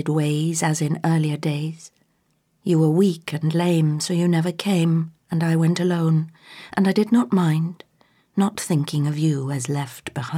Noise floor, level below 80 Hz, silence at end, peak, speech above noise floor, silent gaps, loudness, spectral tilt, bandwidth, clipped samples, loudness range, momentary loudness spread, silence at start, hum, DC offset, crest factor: -67 dBFS; -68 dBFS; 0 s; -6 dBFS; 46 dB; none; -21 LUFS; -6.5 dB/octave; 14.5 kHz; under 0.1%; 2 LU; 11 LU; 0 s; none; under 0.1%; 16 dB